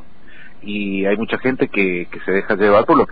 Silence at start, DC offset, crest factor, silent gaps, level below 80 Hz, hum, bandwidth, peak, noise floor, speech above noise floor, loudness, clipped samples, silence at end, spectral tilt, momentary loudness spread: 0.4 s; 4%; 16 dB; none; -46 dBFS; none; 5 kHz; -2 dBFS; -44 dBFS; 27 dB; -17 LUFS; under 0.1%; 0 s; -9.5 dB/octave; 11 LU